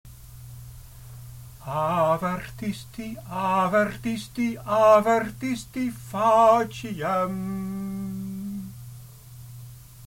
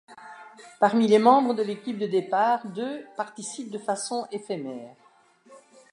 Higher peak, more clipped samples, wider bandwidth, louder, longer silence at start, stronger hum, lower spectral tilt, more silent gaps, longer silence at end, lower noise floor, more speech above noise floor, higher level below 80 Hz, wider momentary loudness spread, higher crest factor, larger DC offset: about the same, -6 dBFS vs -4 dBFS; neither; first, 17 kHz vs 11 kHz; about the same, -24 LUFS vs -25 LUFS; about the same, 0.05 s vs 0.1 s; neither; about the same, -6 dB/octave vs -5 dB/octave; neither; second, 0 s vs 0.35 s; second, -44 dBFS vs -58 dBFS; second, 20 dB vs 34 dB; first, -52 dBFS vs -80 dBFS; first, 25 LU vs 20 LU; about the same, 20 dB vs 22 dB; neither